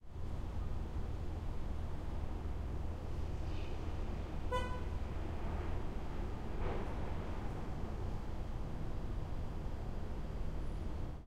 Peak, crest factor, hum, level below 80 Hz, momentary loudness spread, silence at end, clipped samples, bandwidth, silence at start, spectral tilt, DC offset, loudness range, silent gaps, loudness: -24 dBFS; 14 dB; none; -42 dBFS; 3 LU; 0 s; under 0.1%; 9 kHz; 0 s; -7.5 dB/octave; under 0.1%; 2 LU; none; -44 LUFS